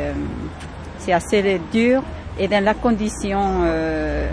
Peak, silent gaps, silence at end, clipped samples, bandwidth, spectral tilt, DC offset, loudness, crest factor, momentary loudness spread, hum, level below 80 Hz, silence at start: -4 dBFS; none; 0 s; under 0.1%; 11 kHz; -6 dB/octave; under 0.1%; -20 LUFS; 16 dB; 13 LU; none; -32 dBFS; 0 s